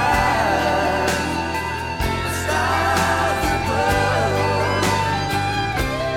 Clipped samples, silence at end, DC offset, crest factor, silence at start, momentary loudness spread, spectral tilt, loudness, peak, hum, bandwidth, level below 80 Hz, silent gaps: under 0.1%; 0 s; 0.3%; 14 dB; 0 s; 5 LU; -4.5 dB/octave; -20 LUFS; -4 dBFS; none; 18 kHz; -34 dBFS; none